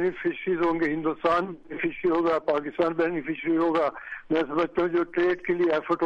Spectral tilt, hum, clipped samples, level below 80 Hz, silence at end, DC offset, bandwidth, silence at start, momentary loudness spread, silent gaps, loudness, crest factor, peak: -7.5 dB/octave; none; under 0.1%; -58 dBFS; 0 s; under 0.1%; 6.4 kHz; 0 s; 5 LU; none; -26 LUFS; 14 dB; -12 dBFS